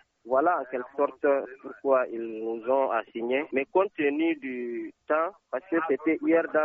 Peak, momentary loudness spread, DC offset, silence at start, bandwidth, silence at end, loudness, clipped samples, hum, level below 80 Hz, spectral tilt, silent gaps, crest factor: -10 dBFS; 9 LU; under 0.1%; 0.25 s; 3.7 kHz; 0 s; -28 LUFS; under 0.1%; none; -76 dBFS; -3.5 dB/octave; none; 16 dB